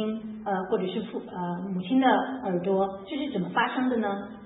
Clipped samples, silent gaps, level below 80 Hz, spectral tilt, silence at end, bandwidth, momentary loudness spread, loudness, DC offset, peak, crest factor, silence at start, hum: under 0.1%; none; -64 dBFS; -10.5 dB/octave; 0 s; 4 kHz; 10 LU; -28 LUFS; under 0.1%; -10 dBFS; 18 dB; 0 s; none